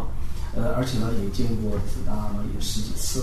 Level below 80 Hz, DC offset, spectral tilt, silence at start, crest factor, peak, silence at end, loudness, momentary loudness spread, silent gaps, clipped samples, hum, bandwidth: -28 dBFS; under 0.1%; -5.5 dB/octave; 0 s; 12 dB; -10 dBFS; 0 s; -28 LUFS; 6 LU; none; under 0.1%; none; 13.5 kHz